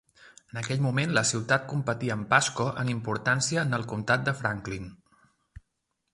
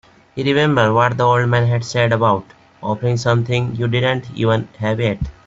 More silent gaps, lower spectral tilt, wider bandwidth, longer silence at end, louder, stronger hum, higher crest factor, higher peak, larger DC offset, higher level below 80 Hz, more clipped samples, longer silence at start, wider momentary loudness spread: neither; second, -4 dB/octave vs -6.5 dB/octave; first, 11.5 kHz vs 7.8 kHz; first, 1.2 s vs 0.15 s; second, -27 LUFS vs -17 LUFS; neither; first, 22 dB vs 14 dB; second, -6 dBFS vs -2 dBFS; neither; second, -58 dBFS vs -42 dBFS; neither; about the same, 0.25 s vs 0.35 s; first, 12 LU vs 8 LU